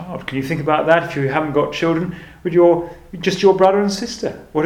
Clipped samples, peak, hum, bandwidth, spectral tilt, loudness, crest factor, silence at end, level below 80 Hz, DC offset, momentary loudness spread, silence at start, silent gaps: under 0.1%; 0 dBFS; none; 15.5 kHz; -6 dB/octave; -17 LUFS; 18 dB; 0 s; -48 dBFS; under 0.1%; 12 LU; 0 s; none